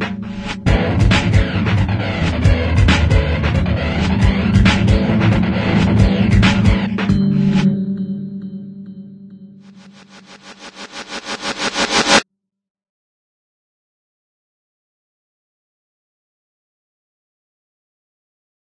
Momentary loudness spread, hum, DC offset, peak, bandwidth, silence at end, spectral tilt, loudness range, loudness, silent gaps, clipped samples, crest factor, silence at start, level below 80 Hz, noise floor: 16 LU; none; under 0.1%; 0 dBFS; 10.5 kHz; 6.4 s; -5.5 dB/octave; 11 LU; -15 LUFS; none; under 0.1%; 18 dB; 0 s; -26 dBFS; -44 dBFS